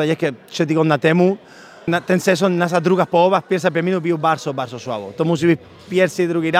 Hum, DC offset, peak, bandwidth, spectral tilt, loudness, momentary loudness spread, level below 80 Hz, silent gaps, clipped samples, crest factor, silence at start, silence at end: none; under 0.1%; -2 dBFS; 15.5 kHz; -6 dB/octave; -18 LUFS; 10 LU; -62 dBFS; none; under 0.1%; 16 dB; 0 s; 0 s